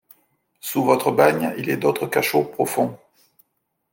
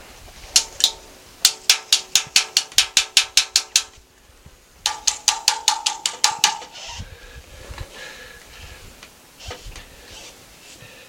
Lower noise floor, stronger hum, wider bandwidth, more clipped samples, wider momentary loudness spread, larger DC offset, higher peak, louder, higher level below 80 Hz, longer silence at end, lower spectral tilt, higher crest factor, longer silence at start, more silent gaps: first, -74 dBFS vs -50 dBFS; neither; about the same, 17 kHz vs 17 kHz; neither; second, 8 LU vs 24 LU; neither; about the same, -2 dBFS vs 0 dBFS; about the same, -20 LUFS vs -18 LUFS; second, -66 dBFS vs -48 dBFS; first, 0.95 s vs 0.2 s; first, -5 dB/octave vs 2 dB/octave; about the same, 20 dB vs 24 dB; first, 0.65 s vs 0.2 s; neither